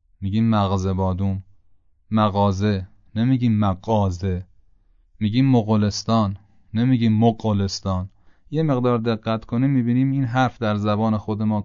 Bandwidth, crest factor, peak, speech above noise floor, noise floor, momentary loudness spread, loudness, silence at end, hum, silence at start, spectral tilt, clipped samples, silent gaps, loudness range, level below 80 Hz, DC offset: 7.4 kHz; 14 dB; -6 dBFS; 36 dB; -56 dBFS; 9 LU; -21 LUFS; 0 s; none; 0.2 s; -7.5 dB/octave; under 0.1%; none; 2 LU; -50 dBFS; under 0.1%